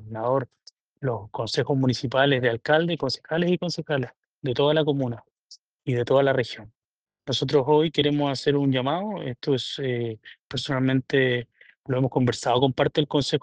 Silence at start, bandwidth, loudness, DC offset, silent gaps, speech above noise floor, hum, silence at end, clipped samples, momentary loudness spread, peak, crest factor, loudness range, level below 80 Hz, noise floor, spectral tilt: 0 s; 9.4 kHz; -24 LUFS; under 0.1%; none; 30 dB; none; 0.05 s; under 0.1%; 11 LU; -6 dBFS; 20 dB; 2 LU; -60 dBFS; -54 dBFS; -6 dB/octave